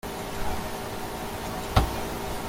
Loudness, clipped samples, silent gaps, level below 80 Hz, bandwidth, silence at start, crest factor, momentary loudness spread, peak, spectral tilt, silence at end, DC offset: -31 LUFS; under 0.1%; none; -36 dBFS; 17 kHz; 0.05 s; 24 dB; 8 LU; -6 dBFS; -5 dB/octave; 0 s; under 0.1%